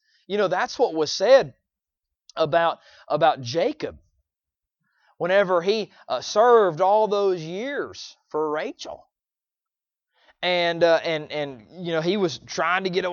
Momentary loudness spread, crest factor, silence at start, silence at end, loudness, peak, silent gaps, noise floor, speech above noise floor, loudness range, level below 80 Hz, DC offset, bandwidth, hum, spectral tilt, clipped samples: 16 LU; 20 dB; 0.3 s; 0 s; -22 LUFS; -4 dBFS; none; under -90 dBFS; over 68 dB; 5 LU; -66 dBFS; under 0.1%; 7.2 kHz; none; -4.5 dB/octave; under 0.1%